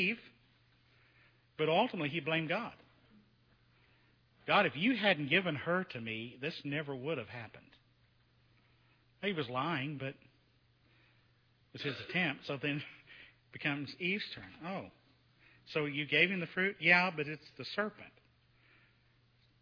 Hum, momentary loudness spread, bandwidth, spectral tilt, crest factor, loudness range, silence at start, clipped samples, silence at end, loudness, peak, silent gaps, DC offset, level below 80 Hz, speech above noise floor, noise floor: none; 18 LU; 5.4 kHz; -6.5 dB/octave; 26 dB; 9 LU; 0 s; under 0.1%; 1.5 s; -34 LUFS; -12 dBFS; none; under 0.1%; -76 dBFS; 35 dB; -70 dBFS